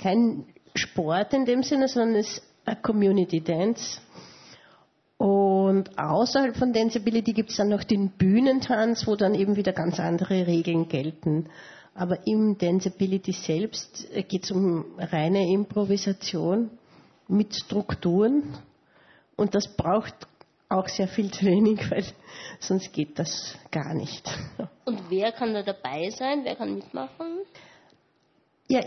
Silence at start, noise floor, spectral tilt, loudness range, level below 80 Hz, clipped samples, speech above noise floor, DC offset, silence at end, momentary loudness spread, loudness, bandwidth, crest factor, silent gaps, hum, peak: 0 s; -67 dBFS; -6 dB/octave; 6 LU; -60 dBFS; under 0.1%; 42 dB; under 0.1%; 0 s; 12 LU; -26 LUFS; 6.4 kHz; 16 dB; none; none; -10 dBFS